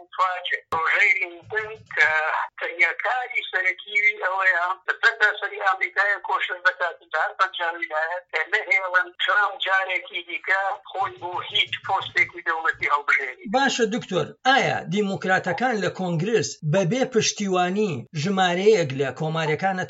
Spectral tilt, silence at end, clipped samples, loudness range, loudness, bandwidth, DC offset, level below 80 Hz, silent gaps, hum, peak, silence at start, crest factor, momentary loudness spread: -3.5 dB/octave; 0 s; under 0.1%; 2 LU; -22 LUFS; 8 kHz; under 0.1%; -70 dBFS; none; none; -4 dBFS; 0 s; 20 dB; 8 LU